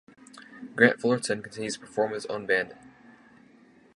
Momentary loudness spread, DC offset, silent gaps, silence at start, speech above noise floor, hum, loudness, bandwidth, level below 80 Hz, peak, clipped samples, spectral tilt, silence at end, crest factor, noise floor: 17 LU; under 0.1%; none; 0.35 s; 30 dB; none; -27 LUFS; 11.5 kHz; -70 dBFS; -4 dBFS; under 0.1%; -4.5 dB/octave; 1.2 s; 26 dB; -57 dBFS